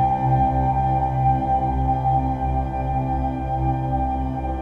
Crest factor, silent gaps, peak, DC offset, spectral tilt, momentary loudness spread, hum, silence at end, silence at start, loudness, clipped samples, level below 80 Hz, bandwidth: 12 dB; none; -8 dBFS; under 0.1%; -10 dB/octave; 5 LU; none; 0 s; 0 s; -22 LUFS; under 0.1%; -28 dBFS; 4.2 kHz